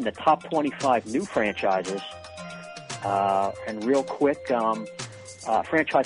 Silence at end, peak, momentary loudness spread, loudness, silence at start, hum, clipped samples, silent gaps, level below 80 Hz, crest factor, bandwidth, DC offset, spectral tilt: 0 s; -6 dBFS; 15 LU; -25 LUFS; 0 s; none; under 0.1%; none; -62 dBFS; 18 dB; 10.5 kHz; under 0.1%; -4.5 dB/octave